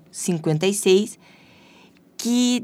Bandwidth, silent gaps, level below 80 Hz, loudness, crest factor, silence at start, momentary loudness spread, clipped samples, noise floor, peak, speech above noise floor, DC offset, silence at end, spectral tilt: 16 kHz; none; -74 dBFS; -21 LUFS; 16 dB; 0.15 s; 12 LU; under 0.1%; -52 dBFS; -6 dBFS; 32 dB; under 0.1%; 0 s; -4.5 dB/octave